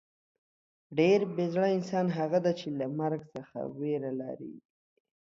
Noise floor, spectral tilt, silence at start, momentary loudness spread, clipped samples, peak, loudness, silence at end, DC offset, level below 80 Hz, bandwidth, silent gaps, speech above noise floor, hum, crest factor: under -90 dBFS; -7.5 dB/octave; 0.9 s; 14 LU; under 0.1%; -12 dBFS; -30 LUFS; 0.6 s; under 0.1%; -76 dBFS; 7.6 kHz; none; over 60 dB; none; 18 dB